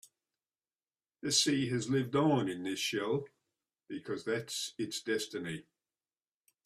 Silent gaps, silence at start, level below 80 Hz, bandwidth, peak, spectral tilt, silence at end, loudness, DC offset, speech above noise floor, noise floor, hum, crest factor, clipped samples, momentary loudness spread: none; 1.25 s; -74 dBFS; 14.5 kHz; -14 dBFS; -4 dB/octave; 1.05 s; -33 LUFS; under 0.1%; over 56 dB; under -90 dBFS; none; 22 dB; under 0.1%; 14 LU